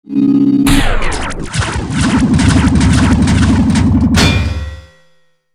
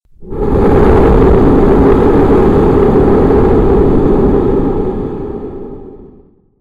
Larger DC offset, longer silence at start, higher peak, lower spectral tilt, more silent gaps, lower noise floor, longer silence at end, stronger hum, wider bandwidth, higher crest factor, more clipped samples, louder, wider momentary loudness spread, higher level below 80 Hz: neither; about the same, 0.1 s vs 0.2 s; about the same, 0 dBFS vs 0 dBFS; second, -5.5 dB/octave vs -10 dB/octave; neither; first, -53 dBFS vs -43 dBFS; first, 0.75 s vs 0.5 s; neither; first, 14.5 kHz vs 7.8 kHz; about the same, 12 dB vs 8 dB; neither; second, -12 LUFS vs -9 LUFS; second, 9 LU vs 14 LU; about the same, -20 dBFS vs -16 dBFS